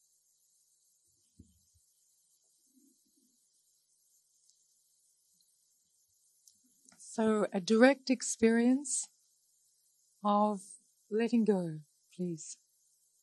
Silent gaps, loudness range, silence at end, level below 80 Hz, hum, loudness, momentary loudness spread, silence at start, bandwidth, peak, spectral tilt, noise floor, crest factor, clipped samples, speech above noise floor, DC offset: none; 6 LU; 0.7 s; -78 dBFS; none; -31 LUFS; 22 LU; 7 s; 12 kHz; -10 dBFS; -4.5 dB/octave; -73 dBFS; 26 dB; under 0.1%; 44 dB; under 0.1%